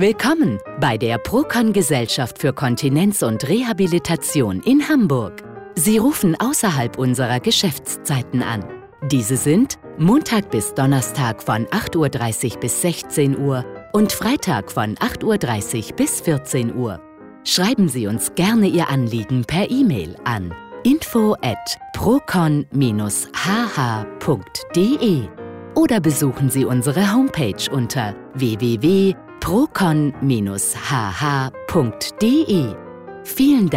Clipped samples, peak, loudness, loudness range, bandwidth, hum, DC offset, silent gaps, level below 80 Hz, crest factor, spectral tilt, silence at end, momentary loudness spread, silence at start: under 0.1%; -6 dBFS; -19 LUFS; 2 LU; 16.5 kHz; none; under 0.1%; none; -46 dBFS; 12 dB; -5 dB/octave; 0 s; 8 LU; 0 s